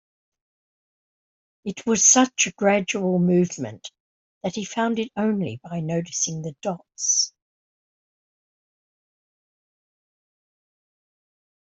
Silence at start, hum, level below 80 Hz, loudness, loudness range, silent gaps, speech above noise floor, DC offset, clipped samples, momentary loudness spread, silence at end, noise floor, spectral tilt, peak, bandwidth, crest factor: 1.65 s; none; -66 dBFS; -22 LUFS; 8 LU; 4.00-4.41 s; over 67 dB; under 0.1%; under 0.1%; 16 LU; 4.45 s; under -90 dBFS; -3.5 dB/octave; -4 dBFS; 8.2 kHz; 24 dB